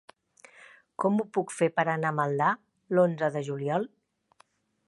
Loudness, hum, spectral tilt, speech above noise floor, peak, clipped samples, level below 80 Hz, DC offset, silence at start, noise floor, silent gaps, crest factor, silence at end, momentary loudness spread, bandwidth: -28 LUFS; none; -6.5 dB/octave; 38 dB; -10 dBFS; under 0.1%; -80 dBFS; under 0.1%; 0.6 s; -65 dBFS; none; 20 dB; 1 s; 7 LU; 11.5 kHz